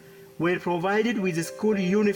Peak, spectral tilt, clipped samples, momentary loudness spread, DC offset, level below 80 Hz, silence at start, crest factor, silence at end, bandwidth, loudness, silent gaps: -12 dBFS; -6 dB/octave; under 0.1%; 4 LU; under 0.1%; -64 dBFS; 0.05 s; 14 dB; 0 s; 17.5 kHz; -25 LUFS; none